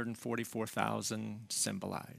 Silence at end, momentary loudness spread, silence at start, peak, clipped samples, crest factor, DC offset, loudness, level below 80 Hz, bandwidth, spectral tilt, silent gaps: 0 s; 5 LU; 0 s; -14 dBFS; under 0.1%; 24 dB; under 0.1%; -37 LUFS; -76 dBFS; 16 kHz; -3.5 dB/octave; none